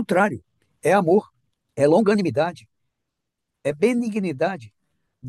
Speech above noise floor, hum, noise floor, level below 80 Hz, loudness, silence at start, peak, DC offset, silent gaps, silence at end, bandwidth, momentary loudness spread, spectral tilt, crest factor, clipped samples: 61 dB; none; -81 dBFS; -68 dBFS; -21 LUFS; 0 s; -6 dBFS; under 0.1%; none; 0 s; 12.5 kHz; 12 LU; -6.5 dB/octave; 16 dB; under 0.1%